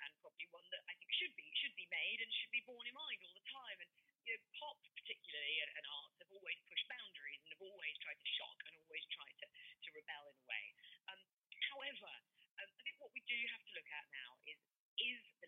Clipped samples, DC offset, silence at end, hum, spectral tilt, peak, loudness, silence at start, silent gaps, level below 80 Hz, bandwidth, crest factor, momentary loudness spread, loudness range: under 0.1%; under 0.1%; 0 s; none; 4.5 dB/octave; -28 dBFS; -47 LUFS; 0 s; 4.15-4.19 s, 11.33-11.41 s, 12.51-12.57 s, 14.76-14.97 s; under -90 dBFS; 7 kHz; 22 dB; 15 LU; 6 LU